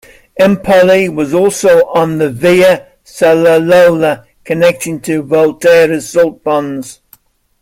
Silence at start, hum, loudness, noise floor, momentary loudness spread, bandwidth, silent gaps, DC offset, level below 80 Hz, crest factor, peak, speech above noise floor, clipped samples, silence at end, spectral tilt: 0.35 s; none; -10 LUFS; -47 dBFS; 10 LU; 16 kHz; none; under 0.1%; -48 dBFS; 10 dB; 0 dBFS; 38 dB; under 0.1%; 0.7 s; -5 dB/octave